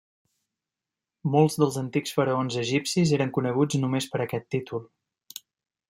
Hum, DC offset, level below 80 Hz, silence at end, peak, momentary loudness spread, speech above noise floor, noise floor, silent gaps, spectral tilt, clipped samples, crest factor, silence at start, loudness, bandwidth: none; under 0.1%; -66 dBFS; 1.05 s; -8 dBFS; 14 LU; 64 dB; -89 dBFS; none; -5.5 dB/octave; under 0.1%; 18 dB; 1.25 s; -25 LUFS; 16 kHz